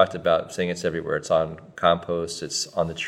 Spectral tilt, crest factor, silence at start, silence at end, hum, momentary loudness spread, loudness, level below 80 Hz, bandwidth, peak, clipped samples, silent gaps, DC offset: -4 dB/octave; 22 dB; 0 s; 0 s; none; 6 LU; -25 LUFS; -58 dBFS; 14.5 kHz; -2 dBFS; under 0.1%; none; under 0.1%